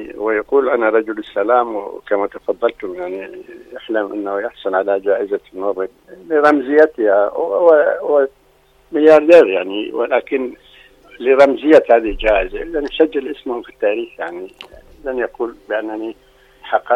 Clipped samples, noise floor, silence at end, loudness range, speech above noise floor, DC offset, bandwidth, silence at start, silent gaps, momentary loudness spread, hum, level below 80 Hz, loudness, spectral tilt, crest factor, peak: under 0.1%; -53 dBFS; 0 s; 9 LU; 37 dB; under 0.1%; 8.6 kHz; 0 s; none; 16 LU; none; -42 dBFS; -16 LUFS; -5.5 dB/octave; 16 dB; 0 dBFS